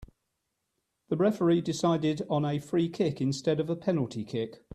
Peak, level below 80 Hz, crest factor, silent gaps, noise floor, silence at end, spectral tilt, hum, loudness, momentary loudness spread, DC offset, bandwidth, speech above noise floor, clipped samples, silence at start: -14 dBFS; -62 dBFS; 16 dB; none; -81 dBFS; 0.2 s; -7 dB/octave; none; -29 LUFS; 8 LU; under 0.1%; 13 kHz; 53 dB; under 0.1%; 0 s